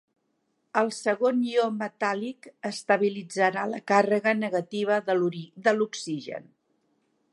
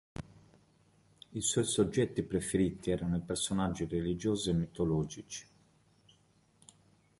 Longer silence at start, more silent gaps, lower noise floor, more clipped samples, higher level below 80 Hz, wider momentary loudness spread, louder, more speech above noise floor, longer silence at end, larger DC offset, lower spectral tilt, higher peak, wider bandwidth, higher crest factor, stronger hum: first, 0.75 s vs 0.2 s; neither; first, -74 dBFS vs -68 dBFS; neither; second, -82 dBFS vs -54 dBFS; second, 11 LU vs 15 LU; first, -26 LUFS vs -33 LUFS; first, 48 dB vs 36 dB; second, 0.9 s vs 1.75 s; neither; about the same, -5 dB/octave vs -5 dB/octave; first, -8 dBFS vs -16 dBFS; about the same, 11.5 kHz vs 11.5 kHz; about the same, 20 dB vs 20 dB; neither